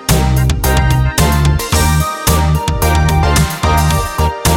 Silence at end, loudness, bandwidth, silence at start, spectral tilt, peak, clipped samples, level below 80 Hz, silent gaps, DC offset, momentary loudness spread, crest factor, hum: 0 s; -13 LUFS; 18 kHz; 0 s; -4.5 dB/octave; 0 dBFS; under 0.1%; -16 dBFS; none; under 0.1%; 2 LU; 12 dB; none